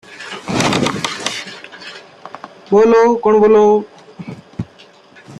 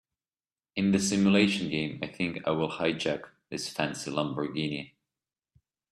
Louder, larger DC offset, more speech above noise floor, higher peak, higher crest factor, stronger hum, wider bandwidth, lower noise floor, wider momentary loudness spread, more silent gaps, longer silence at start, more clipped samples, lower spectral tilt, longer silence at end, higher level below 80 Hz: first, -13 LUFS vs -29 LUFS; neither; second, 34 dB vs over 61 dB; first, -2 dBFS vs -10 dBFS; second, 14 dB vs 22 dB; neither; about the same, 12 kHz vs 13 kHz; second, -44 dBFS vs under -90 dBFS; first, 24 LU vs 13 LU; neither; second, 0.1 s vs 0.75 s; neither; about the same, -4.5 dB/octave vs -4.5 dB/octave; second, 0.05 s vs 1.05 s; first, -52 dBFS vs -64 dBFS